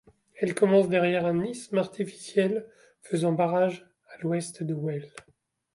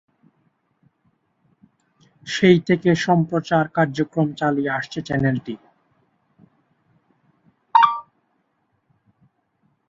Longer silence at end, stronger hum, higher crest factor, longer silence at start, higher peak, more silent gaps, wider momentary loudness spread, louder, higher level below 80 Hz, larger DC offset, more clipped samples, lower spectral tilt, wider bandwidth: second, 0.55 s vs 1.85 s; neither; about the same, 18 dB vs 22 dB; second, 0.35 s vs 2.25 s; second, -10 dBFS vs -2 dBFS; neither; about the same, 13 LU vs 12 LU; second, -27 LUFS vs -20 LUFS; second, -70 dBFS vs -60 dBFS; neither; neither; about the same, -6.5 dB/octave vs -6.5 dB/octave; first, 11.5 kHz vs 7.8 kHz